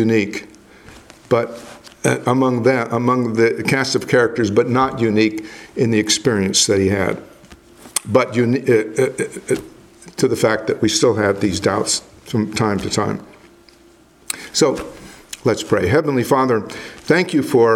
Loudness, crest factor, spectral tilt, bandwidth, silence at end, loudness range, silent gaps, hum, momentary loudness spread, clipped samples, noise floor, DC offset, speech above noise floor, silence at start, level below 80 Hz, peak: -18 LUFS; 18 dB; -4.5 dB/octave; 17 kHz; 0 s; 5 LU; none; none; 12 LU; under 0.1%; -49 dBFS; under 0.1%; 32 dB; 0 s; -52 dBFS; 0 dBFS